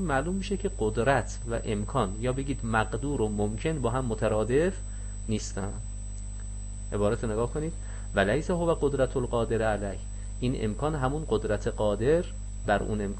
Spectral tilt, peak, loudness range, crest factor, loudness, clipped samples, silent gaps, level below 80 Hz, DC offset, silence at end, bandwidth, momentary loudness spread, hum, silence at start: -6 dB/octave; -12 dBFS; 3 LU; 18 dB; -29 LUFS; under 0.1%; none; -36 dBFS; under 0.1%; 0 s; 8.6 kHz; 12 LU; 50 Hz at -35 dBFS; 0 s